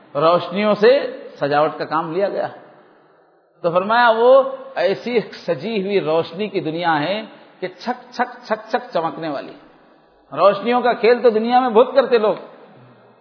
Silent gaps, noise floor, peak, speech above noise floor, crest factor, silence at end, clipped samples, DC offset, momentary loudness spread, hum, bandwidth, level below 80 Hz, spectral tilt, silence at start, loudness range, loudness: none; -55 dBFS; 0 dBFS; 37 dB; 18 dB; 0.75 s; under 0.1%; under 0.1%; 13 LU; none; 5.4 kHz; -78 dBFS; -7 dB/octave; 0.15 s; 6 LU; -18 LUFS